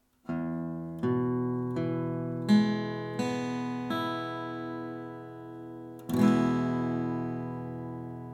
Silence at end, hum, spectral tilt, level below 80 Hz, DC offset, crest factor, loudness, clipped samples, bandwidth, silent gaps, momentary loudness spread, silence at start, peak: 0 s; none; -7.5 dB/octave; -64 dBFS; under 0.1%; 18 dB; -31 LUFS; under 0.1%; 16 kHz; none; 16 LU; 0.25 s; -12 dBFS